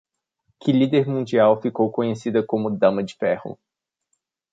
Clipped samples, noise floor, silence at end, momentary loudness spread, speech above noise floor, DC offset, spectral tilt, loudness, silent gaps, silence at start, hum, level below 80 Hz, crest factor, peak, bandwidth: under 0.1%; -75 dBFS; 1 s; 7 LU; 55 dB; under 0.1%; -7.5 dB/octave; -21 LUFS; none; 0.65 s; none; -64 dBFS; 18 dB; -4 dBFS; 7.8 kHz